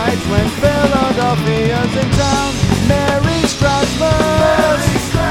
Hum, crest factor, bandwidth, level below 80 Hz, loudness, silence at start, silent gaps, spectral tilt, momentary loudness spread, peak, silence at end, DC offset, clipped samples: none; 14 dB; 17 kHz; -28 dBFS; -14 LUFS; 0 s; none; -5 dB/octave; 3 LU; 0 dBFS; 0 s; under 0.1%; under 0.1%